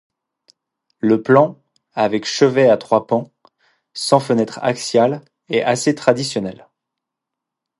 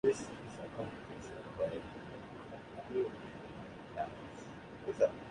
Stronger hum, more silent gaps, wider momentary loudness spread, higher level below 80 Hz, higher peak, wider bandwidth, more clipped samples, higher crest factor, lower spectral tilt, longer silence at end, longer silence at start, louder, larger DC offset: neither; neither; second, 11 LU vs 14 LU; about the same, -62 dBFS vs -64 dBFS; first, 0 dBFS vs -18 dBFS; about the same, 11.5 kHz vs 11 kHz; neither; about the same, 18 dB vs 22 dB; about the same, -5 dB/octave vs -5.5 dB/octave; first, 1.25 s vs 0 s; first, 1.05 s vs 0.05 s; first, -17 LUFS vs -42 LUFS; neither